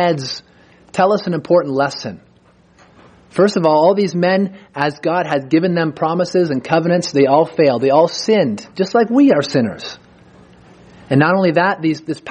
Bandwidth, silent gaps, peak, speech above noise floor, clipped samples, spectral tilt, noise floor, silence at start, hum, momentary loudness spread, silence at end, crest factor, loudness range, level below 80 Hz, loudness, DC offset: 10 kHz; none; 0 dBFS; 36 dB; under 0.1%; -6 dB/octave; -51 dBFS; 0 s; none; 10 LU; 0 s; 16 dB; 3 LU; -60 dBFS; -15 LUFS; under 0.1%